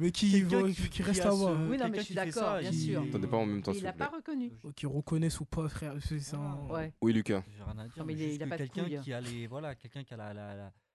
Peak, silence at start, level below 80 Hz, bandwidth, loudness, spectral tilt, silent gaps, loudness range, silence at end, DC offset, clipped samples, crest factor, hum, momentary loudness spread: -16 dBFS; 0 s; -52 dBFS; 12.5 kHz; -34 LUFS; -6 dB/octave; none; 6 LU; 0.25 s; under 0.1%; under 0.1%; 18 dB; none; 15 LU